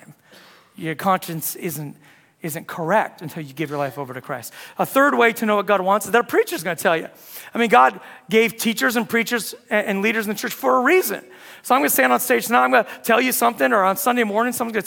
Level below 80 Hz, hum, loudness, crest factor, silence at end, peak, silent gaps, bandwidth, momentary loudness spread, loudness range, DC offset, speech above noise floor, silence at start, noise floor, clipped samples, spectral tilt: -70 dBFS; none; -19 LUFS; 20 dB; 0 s; 0 dBFS; none; 18 kHz; 15 LU; 7 LU; under 0.1%; 29 dB; 0.1 s; -49 dBFS; under 0.1%; -3.5 dB/octave